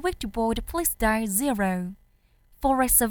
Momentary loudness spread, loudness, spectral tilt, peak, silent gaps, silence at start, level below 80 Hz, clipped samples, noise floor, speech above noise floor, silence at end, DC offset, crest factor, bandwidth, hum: 9 LU; -25 LUFS; -3.5 dB/octave; -6 dBFS; none; 0 s; -40 dBFS; under 0.1%; -61 dBFS; 36 dB; 0 s; under 0.1%; 20 dB; over 20 kHz; none